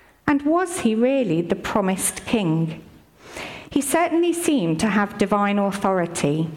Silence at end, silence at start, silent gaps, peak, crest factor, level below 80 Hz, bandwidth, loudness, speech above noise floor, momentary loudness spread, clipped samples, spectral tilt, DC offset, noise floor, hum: 0 s; 0.25 s; none; -8 dBFS; 14 dB; -52 dBFS; 16.5 kHz; -21 LUFS; 22 dB; 7 LU; under 0.1%; -5 dB/octave; under 0.1%; -42 dBFS; none